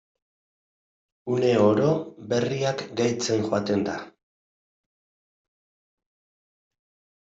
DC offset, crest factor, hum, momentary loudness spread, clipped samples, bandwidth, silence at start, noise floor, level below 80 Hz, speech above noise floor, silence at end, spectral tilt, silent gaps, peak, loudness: under 0.1%; 20 dB; none; 9 LU; under 0.1%; 8 kHz; 1.25 s; under -90 dBFS; -66 dBFS; over 67 dB; 3.2 s; -5.5 dB/octave; none; -8 dBFS; -24 LUFS